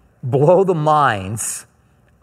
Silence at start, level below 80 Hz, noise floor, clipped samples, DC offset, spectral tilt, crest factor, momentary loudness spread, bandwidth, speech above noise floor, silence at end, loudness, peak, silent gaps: 0.25 s; -58 dBFS; -55 dBFS; under 0.1%; under 0.1%; -5.5 dB/octave; 16 dB; 10 LU; 16 kHz; 39 dB; 0.6 s; -16 LUFS; 0 dBFS; none